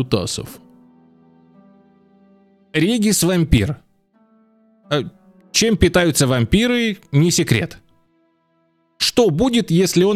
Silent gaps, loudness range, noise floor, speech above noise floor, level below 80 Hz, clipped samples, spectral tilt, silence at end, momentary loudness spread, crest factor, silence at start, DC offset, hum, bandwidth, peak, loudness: none; 4 LU; -63 dBFS; 46 dB; -36 dBFS; under 0.1%; -4.5 dB/octave; 0 s; 10 LU; 18 dB; 0 s; under 0.1%; none; 16 kHz; 0 dBFS; -17 LUFS